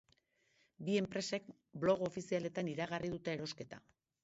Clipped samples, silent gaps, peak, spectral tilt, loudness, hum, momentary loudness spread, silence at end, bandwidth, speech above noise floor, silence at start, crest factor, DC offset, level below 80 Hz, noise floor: under 0.1%; none; -22 dBFS; -5 dB/octave; -39 LUFS; none; 14 LU; 0.45 s; 7.6 kHz; 37 dB; 0.8 s; 20 dB; under 0.1%; -72 dBFS; -77 dBFS